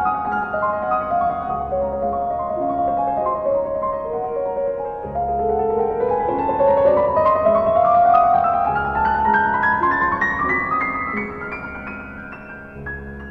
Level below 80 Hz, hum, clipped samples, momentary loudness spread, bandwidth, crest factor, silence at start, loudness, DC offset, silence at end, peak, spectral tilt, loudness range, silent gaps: -42 dBFS; none; under 0.1%; 15 LU; 6.2 kHz; 16 dB; 0 s; -19 LUFS; under 0.1%; 0 s; -4 dBFS; -8 dB/octave; 6 LU; none